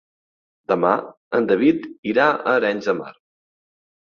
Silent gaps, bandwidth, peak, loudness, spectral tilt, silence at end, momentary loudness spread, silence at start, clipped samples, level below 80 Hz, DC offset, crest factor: 1.17-1.31 s, 1.98-2.03 s; 6.8 kHz; -2 dBFS; -20 LUFS; -6.5 dB/octave; 1.05 s; 9 LU; 0.7 s; under 0.1%; -64 dBFS; under 0.1%; 20 dB